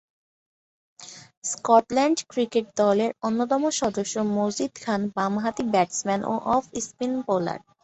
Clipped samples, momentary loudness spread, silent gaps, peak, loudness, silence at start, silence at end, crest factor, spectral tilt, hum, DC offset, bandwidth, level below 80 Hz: under 0.1%; 11 LU; 1.37-1.42 s; -4 dBFS; -25 LUFS; 1 s; 0.25 s; 20 dB; -4.5 dB/octave; none; under 0.1%; 8.4 kHz; -62 dBFS